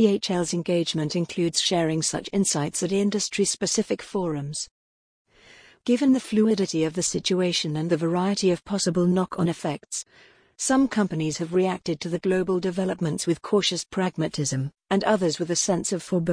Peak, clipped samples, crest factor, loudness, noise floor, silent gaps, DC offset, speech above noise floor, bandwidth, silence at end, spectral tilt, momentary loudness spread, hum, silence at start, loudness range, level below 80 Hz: -8 dBFS; under 0.1%; 16 dB; -24 LUFS; -52 dBFS; 4.71-5.25 s; under 0.1%; 28 dB; 10.5 kHz; 0 s; -4.5 dB/octave; 7 LU; none; 0 s; 2 LU; -58 dBFS